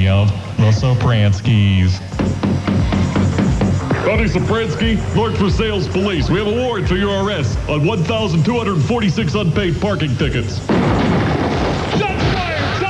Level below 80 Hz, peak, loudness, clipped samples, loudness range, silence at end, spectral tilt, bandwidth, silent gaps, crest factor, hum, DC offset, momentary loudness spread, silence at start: -28 dBFS; -4 dBFS; -16 LUFS; under 0.1%; 1 LU; 0 s; -6.5 dB/octave; 11 kHz; none; 12 dB; none; 0.2%; 4 LU; 0 s